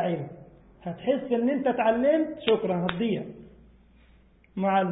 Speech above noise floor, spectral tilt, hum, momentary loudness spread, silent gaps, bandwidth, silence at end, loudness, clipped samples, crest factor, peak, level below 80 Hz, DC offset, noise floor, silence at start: 32 dB; -10.5 dB/octave; none; 16 LU; none; 4 kHz; 0 s; -26 LUFS; under 0.1%; 20 dB; -8 dBFS; -60 dBFS; under 0.1%; -58 dBFS; 0 s